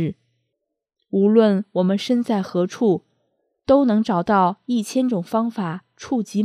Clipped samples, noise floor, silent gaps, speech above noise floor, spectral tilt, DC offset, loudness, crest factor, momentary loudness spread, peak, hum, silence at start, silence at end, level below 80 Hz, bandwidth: under 0.1%; -79 dBFS; none; 60 dB; -7 dB/octave; under 0.1%; -20 LUFS; 18 dB; 10 LU; -2 dBFS; none; 0 s; 0 s; -60 dBFS; 13.5 kHz